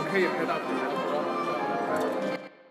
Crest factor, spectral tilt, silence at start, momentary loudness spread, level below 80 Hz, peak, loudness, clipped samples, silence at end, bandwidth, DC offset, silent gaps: 16 dB; -5.5 dB/octave; 0 s; 5 LU; -86 dBFS; -12 dBFS; -29 LUFS; under 0.1%; 0 s; 15.5 kHz; under 0.1%; none